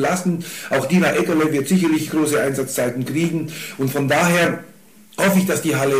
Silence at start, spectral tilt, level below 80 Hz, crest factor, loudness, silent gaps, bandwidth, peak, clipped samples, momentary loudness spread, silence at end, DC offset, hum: 0 s; -5 dB/octave; -60 dBFS; 14 dB; -19 LUFS; none; 15.5 kHz; -6 dBFS; under 0.1%; 8 LU; 0 s; 0.3%; none